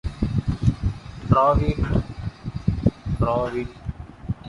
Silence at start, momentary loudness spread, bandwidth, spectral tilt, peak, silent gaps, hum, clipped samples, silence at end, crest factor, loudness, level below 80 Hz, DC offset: 0.05 s; 15 LU; 11 kHz; -9 dB/octave; -4 dBFS; none; none; under 0.1%; 0 s; 20 dB; -24 LUFS; -32 dBFS; under 0.1%